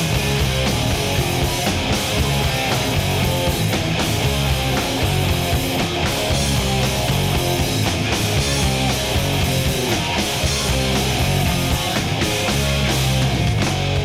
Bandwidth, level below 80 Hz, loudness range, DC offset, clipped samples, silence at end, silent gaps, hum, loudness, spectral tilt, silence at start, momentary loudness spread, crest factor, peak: 16.5 kHz; -28 dBFS; 0 LU; under 0.1%; under 0.1%; 0 s; none; none; -19 LUFS; -4 dB/octave; 0 s; 1 LU; 12 dB; -6 dBFS